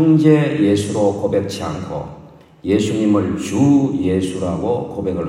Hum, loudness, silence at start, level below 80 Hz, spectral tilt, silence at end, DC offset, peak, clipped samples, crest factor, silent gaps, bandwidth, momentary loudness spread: none; -17 LUFS; 0 s; -50 dBFS; -7 dB/octave; 0 s; under 0.1%; 0 dBFS; under 0.1%; 16 dB; none; 12 kHz; 12 LU